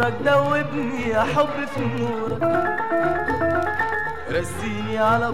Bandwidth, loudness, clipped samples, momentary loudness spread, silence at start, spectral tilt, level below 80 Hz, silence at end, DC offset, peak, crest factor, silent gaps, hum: 16 kHz; -22 LUFS; under 0.1%; 7 LU; 0 s; -6 dB/octave; -46 dBFS; 0 s; 2%; -6 dBFS; 16 dB; none; none